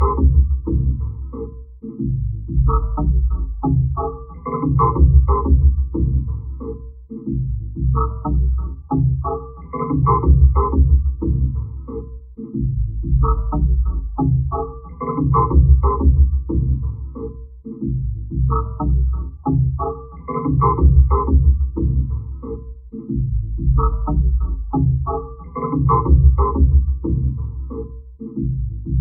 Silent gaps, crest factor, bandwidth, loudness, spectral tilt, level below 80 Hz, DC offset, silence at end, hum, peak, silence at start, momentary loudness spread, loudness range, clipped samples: none; 16 dB; 2.2 kHz; -19 LUFS; -11 dB/octave; -18 dBFS; under 0.1%; 0 s; none; 0 dBFS; 0 s; 16 LU; 4 LU; under 0.1%